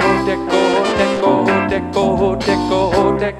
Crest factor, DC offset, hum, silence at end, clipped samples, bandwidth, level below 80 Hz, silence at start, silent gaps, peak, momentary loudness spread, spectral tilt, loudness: 14 dB; under 0.1%; none; 0 s; under 0.1%; 12 kHz; -36 dBFS; 0 s; none; 0 dBFS; 3 LU; -5.5 dB/octave; -15 LUFS